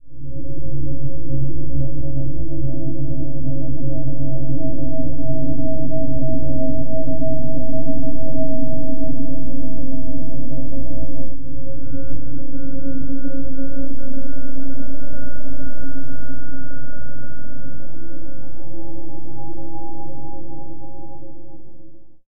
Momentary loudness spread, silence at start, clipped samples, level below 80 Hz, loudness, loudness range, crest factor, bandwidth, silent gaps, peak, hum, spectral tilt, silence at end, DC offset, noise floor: 13 LU; 0 s; under 0.1%; -36 dBFS; -29 LUFS; 12 LU; 10 dB; 1.6 kHz; none; -2 dBFS; none; -13.5 dB/octave; 0 s; 40%; -37 dBFS